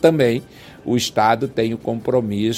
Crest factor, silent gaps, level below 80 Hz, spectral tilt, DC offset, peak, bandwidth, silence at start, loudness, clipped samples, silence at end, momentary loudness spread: 18 dB; none; -52 dBFS; -5.5 dB/octave; under 0.1%; 0 dBFS; 16.5 kHz; 0 s; -19 LUFS; under 0.1%; 0 s; 7 LU